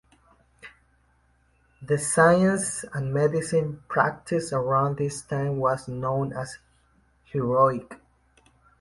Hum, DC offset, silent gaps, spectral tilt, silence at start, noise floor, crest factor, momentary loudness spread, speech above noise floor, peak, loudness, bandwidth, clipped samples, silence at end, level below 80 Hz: none; under 0.1%; none; -5.5 dB/octave; 0.65 s; -64 dBFS; 22 dB; 11 LU; 40 dB; -4 dBFS; -25 LUFS; 11.5 kHz; under 0.1%; 0.85 s; -58 dBFS